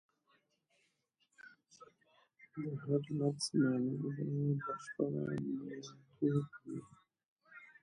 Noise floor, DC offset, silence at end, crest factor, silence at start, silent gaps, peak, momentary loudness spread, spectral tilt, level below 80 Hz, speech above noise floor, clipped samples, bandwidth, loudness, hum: -80 dBFS; under 0.1%; 0.1 s; 18 dB; 1.45 s; 7.26-7.36 s; -22 dBFS; 16 LU; -6.5 dB/octave; -78 dBFS; 43 dB; under 0.1%; 11 kHz; -38 LUFS; none